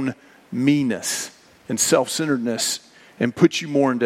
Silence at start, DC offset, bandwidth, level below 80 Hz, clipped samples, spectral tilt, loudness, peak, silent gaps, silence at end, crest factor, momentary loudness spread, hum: 0 s; under 0.1%; 16.5 kHz; -66 dBFS; under 0.1%; -4 dB/octave; -21 LUFS; -2 dBFS; none; 0 s; 20 dB; 11 LU; none